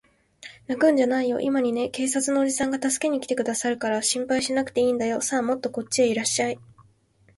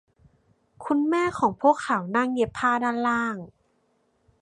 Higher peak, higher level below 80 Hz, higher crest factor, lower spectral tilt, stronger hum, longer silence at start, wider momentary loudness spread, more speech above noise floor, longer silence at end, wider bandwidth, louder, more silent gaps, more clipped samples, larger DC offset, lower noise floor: second, -10 dBFS vs -6 dBFS; about the same, -64 dBFS vs -62 dBFS; about the same, 16 dB vs 20 dB; second, -2.5 dB/octave vs -5.5 dB/octave; neither; second, 0.45 s vs 0.8 s; about the same, 6 LU vs 6 LU; second, 37 dB vs 45 dB; second, 0.75 s vs 0.95 s; about the same, 12 kHz vs 11 kHz; about the same, -24 LUFS vs -24 LUFS; neither; neither; neither; second, -60 dBFS vs -68 dBFS